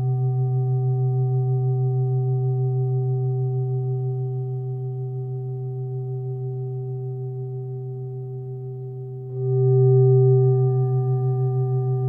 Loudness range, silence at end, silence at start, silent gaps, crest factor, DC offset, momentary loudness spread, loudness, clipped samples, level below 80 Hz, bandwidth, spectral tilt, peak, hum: 10 LU; 0 s; 0 s; none; 14 dB; under 0.1%; 15 LU; -23 LUFS; under 0.1%; -62 dBFS; 1.3 kHz; -14.5 dB/octave; -8 dBFS; none